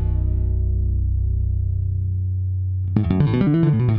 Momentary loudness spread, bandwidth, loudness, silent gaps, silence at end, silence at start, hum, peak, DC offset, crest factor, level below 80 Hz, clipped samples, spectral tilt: 6 LU; 4.5 kHz; -21 LUFS; none; 0 s; 0 s; none; -4 dBFS; under 0.1%; 14 dB; -24 dBFS; under 0.1%; -12 dB/octave